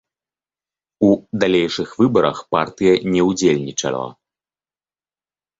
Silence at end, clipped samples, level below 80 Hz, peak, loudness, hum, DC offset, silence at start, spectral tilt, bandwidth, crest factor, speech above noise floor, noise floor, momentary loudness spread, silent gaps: 1.45 s; under 0.1%; -54 dBFS; -2 dBFS; -18 LUFS; none; under 0.1%; 1 s; -5 dB/octave; 8 kHz; 18 dB; over 73 dB; under -90 dBFS; 7 LU; none